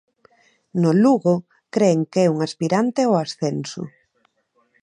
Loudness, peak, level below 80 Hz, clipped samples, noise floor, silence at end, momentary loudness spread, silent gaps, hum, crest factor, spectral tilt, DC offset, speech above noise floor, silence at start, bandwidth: -20 LUFS; -4 dBFS; -70 dBFS; under 0.1%; -66 dBFS; 0.95 s; 13 LU; none; none; 16 dB; -6.5 dB/octave; under 0.1%; 48 dB; 0.75 s; 10.5 kHz